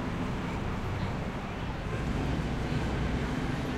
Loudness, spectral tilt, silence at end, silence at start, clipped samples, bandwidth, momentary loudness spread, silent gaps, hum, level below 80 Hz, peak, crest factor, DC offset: -33 LUFS; -6.5 dB/octave; 0 s; 0 s; under 0.1%; 13.5 kHz; 4 LU; none; none; -38 dBFS; -18 dBFS; 14 dB; under 0.1%